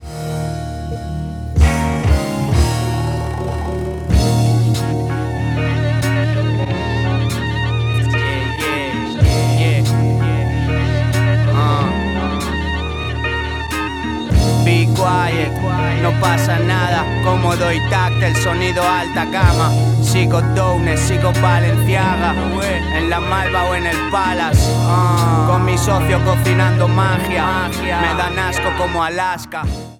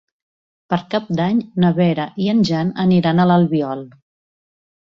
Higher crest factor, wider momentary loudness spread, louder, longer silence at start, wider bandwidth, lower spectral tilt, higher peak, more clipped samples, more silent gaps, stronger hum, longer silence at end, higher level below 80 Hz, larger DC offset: about the same, 16 dB vs 14 dB; about the same, 7 LU vs 9 LU; about the same, -16 LUFS vs -17 LUFS; second, 0 s vs 0.7 s; first, 15.5 kHz vs 7.2 kHz; second, -6 dB/octave vs -8 dB/octave; first, 0 dBFS vs -4 dBFS; neither; neither; neither; second, 0.05 s vs 1.05 s; first, -26 dBFS vs -56 dBFS; neither